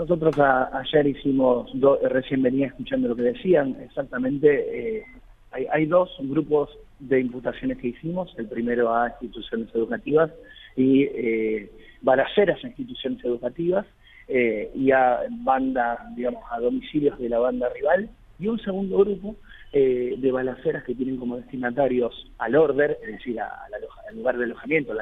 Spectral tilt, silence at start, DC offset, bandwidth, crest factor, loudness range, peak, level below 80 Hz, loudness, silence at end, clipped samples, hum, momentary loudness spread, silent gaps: -9 dB/octave; 0 s; under 0.1%; 4.2 kHz; 18 dB; 3 LU; -4 dBFS; -50 dBFS; -24 LUFS; 0 s; under 0.1%; none; 12 LU; none